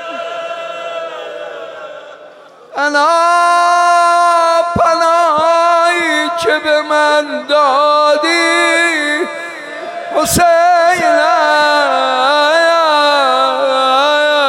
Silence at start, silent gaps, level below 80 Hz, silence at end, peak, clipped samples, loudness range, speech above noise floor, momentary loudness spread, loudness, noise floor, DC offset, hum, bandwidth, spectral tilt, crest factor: 0 s; none; -46 dBFS; 0 s; -2 dBFS; under 0.1%; 3 LU; 27 dB; 14 LU; -11 LUFS; -38 dBFS; under 0.1%; none; 17 kHz; -2.5 dB/octave; 10 dB